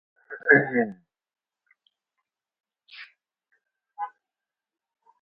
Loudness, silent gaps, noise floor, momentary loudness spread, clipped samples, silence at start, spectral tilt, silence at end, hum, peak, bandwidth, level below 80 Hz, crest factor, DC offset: -22 LUFS; none; -89 dBFS; 26 LU; under 0.1%; 0.3 s; -5 dB/octave; 1.15 s; none; -2 dBFS; 5.6 kHz; -76 dBFS; 28 dB; under 0.1%